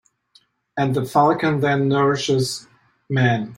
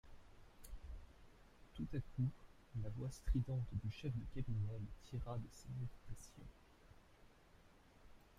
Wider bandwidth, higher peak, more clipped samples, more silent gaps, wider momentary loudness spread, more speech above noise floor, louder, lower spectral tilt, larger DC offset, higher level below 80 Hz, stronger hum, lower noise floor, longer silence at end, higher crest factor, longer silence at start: first, 16.5 kHz vs 14 kHz; first, -4 dBFS vs -28 dBFS; neither; neither; second, 8 LU vs 25 LU; first, 40 dB vs 23 dB; first, -19 LUFS vs -47 LUFS; second, -6 dB/octave vs -7.5 dB/octave; neither; about the same, -58 dBFS vs -54 dBFS; neither; second, -58 dBFS vs -67 dBFS; about the same, 0 s vs 0.05 s; about the same, 16 dB vs 18 dB; first, 0.75 s vs 0.05 s